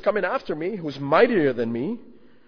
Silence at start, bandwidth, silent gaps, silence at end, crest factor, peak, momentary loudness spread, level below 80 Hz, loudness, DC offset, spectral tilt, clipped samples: 0 s; 5.4 kHz; none; 0.35 s; 20 dB; -4 dBFS; 12 LU; -60 dBFS; -23 LUFS; under 0.1%; -8 dB/octave; under 0.1%